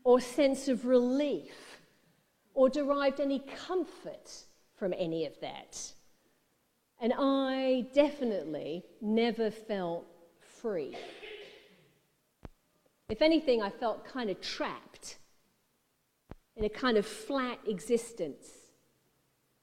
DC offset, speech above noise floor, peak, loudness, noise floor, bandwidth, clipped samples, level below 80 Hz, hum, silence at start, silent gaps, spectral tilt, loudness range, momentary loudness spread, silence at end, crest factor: under 0.1%; 45 dB; -12 dBFS; -32 LUFS; -76 dBFS; 14.5 kHz; under 0.1%; -62 dBFS; none; 0.05 s; none; -4.5 dB/octave; 8 LU; 19 LU; 1.1 s; 22 dB